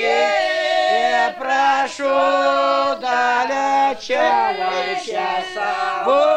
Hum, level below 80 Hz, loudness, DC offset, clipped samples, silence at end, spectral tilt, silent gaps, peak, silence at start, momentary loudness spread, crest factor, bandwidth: none; -64 dBFS; -18 LUFS; under 0.1%; under 0.1%; 0 s; -2 dB/octave; none; -4 dBFS; 0 s; 6 LU; 14 dB; 10 kHz